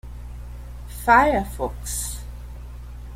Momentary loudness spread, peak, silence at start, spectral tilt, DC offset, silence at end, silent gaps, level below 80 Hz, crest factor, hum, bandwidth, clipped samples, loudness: 23 LU; -2 dBFS; 0.05 s; -4 dB/octave; under 0.1%; 0 s; none; -34 dBFS; 22 dB; 60 Hz at -35 dBFS; 16.5 kHz; under 0.1%; -21 LUFS